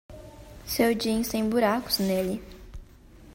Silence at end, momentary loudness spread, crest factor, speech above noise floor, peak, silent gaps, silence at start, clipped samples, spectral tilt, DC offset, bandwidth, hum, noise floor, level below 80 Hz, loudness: 0.05 s; 22 LU; 18 dB; 25 dB; -10 dBFS; none; 0.1 s; under 0.1%; -4.5 dB/octave; under 0.1%; 16.5 kHz; none; -50 dBFS; -48 dBFS; -26 LUFS